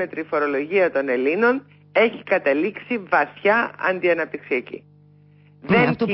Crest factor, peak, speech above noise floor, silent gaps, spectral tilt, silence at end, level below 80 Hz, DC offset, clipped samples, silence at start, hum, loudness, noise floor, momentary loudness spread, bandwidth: 16 dB; -6 dBFS; 31 dB; none; -10.5 dB/octave; 0 s; -62 dBFS; under 0.1%; under 0.1%; 0 s; 50 Hz at -50 dBFS; -21 LUFS; -51 dBFS; 8 LU; 5.8 kHz